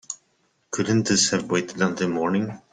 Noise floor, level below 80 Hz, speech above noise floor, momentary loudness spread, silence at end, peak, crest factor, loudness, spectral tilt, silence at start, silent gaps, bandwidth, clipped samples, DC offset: -67 dBFS; -60 dBFS; 45 dB; 13 LU; 0.15 s; -6 dBFS; 18 dB; -23 LUFS; -4 dB/octave; 0.1 s; none; 9.8 kHz; under 0.1%; under 0.1%